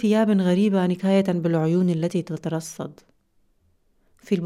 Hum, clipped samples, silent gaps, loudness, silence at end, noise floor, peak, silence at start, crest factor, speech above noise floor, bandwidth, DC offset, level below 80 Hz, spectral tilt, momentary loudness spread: none; under 0.1%; none; -22 LUFS; 0 s; -64 dBFS; -8 dBFS; 0 s; 14 dB; 43 dB; 12.5 kHz; under 0.1%; -66 dBFS; -7.5 dB/octave; 11 LU